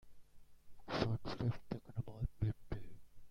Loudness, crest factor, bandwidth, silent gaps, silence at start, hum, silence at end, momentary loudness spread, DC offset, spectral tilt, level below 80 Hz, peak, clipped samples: -43 LUFS; 22 dB; 7.2 kHz; none; 0.05 s; none; 0 s; 11 LU; under 0.1%; -7.5 dB/octave; -54 dBFS; -20 dBFS; under 0.1%